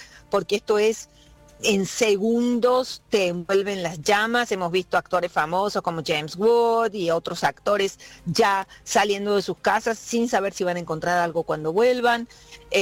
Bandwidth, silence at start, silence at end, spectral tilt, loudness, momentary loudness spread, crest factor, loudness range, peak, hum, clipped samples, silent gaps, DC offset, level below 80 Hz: 16.5 kHz; 0 s; 0 s; -4 dB/octave; -23 LUFS; 6 LU; 14 dB; 1 LU; -8 dBFS; none; under 0.1%; none; under 0.1%; -56 dBFS